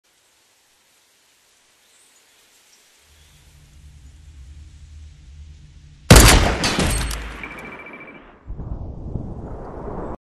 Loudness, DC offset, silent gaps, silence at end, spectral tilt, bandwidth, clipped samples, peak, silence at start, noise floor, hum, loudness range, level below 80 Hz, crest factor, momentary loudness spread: -16 LUFS; under 0.1%; none; 0.05 s; -4 dB/octave; 13 kHz; under 0.1%; 0 dBFS; 4.25 s; -59 dBFS; none; 12 LU; -26 dBFS; 22 dB; 26 LU